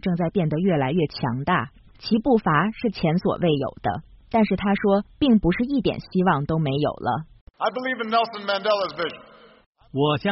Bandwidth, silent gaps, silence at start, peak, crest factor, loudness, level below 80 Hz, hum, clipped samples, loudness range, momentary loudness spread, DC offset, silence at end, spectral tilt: 6 kHz; 7.41-7.47 s, 9.66-9.73 s; 0.05 s; -6 dBFS; 16 dB; -23 LUFS; -46 dBFS; none; under 0.1%; 3 LU; 8 LU; under 0.1%; 0 s; -5.5 dB/octave